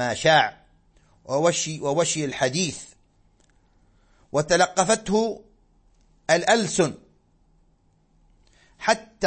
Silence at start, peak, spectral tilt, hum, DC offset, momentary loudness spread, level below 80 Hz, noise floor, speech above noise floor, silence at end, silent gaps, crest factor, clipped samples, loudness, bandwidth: 0 s; -4 dBFS; -3.5 dB/octave; none; under 0.1%; 10 LU; -56 dBFS; -62 dBFS; 40 dB; 0 s; none; 20 dB; under 0.1%; -22 LUFS; 8.8 kHz